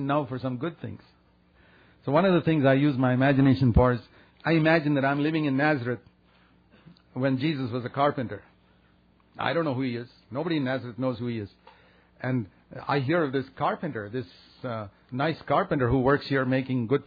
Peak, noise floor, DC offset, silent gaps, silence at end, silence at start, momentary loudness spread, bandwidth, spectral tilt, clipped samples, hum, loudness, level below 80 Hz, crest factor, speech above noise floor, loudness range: -8 dBFS; -61 dBFS; under 0.1%; none; 0.05 s; 0 s; 15 LU; 5 kHz; -10 dB/octave; under 0.1%; none; -26 LUFS; -46 dBFS; 18 dB; 36 dB; 8 LU